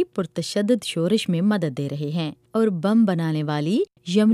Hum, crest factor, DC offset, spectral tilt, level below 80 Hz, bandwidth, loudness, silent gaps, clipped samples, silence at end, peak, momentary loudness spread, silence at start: none; 14 dB; under 0.1%; -6.5 dB/octave; -68 dBFS; 13 kHz; -23 LUFS; none; under 0.1%; 0 s; -8 dBFS; 8 LU; 0 s